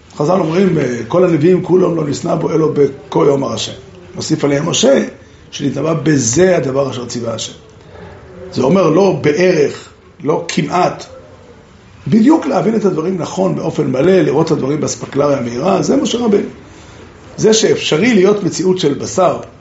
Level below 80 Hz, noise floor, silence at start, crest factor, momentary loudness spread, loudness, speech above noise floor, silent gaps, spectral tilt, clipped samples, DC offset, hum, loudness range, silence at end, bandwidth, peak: -48 dBFS; -40 dBFS; 0.15 s; 14 dB; 11 LU; -13 LUFS; 27 dB; none; -5.5 dB/octave; under 0.1%; under 0.1%; none; 2 LU; 0.1 s; 8.2 kHz; 0 dBFS